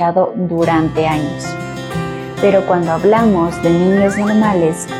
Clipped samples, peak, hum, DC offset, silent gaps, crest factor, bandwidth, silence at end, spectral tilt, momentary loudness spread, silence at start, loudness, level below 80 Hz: under 0.1%; -2 dBFS; none; under 0.1%; none; 12 dB; 15 kHz; 0 s; -6.5 dB/octave; 11 LU; 0 s; -14 LUFS; -40 dBFS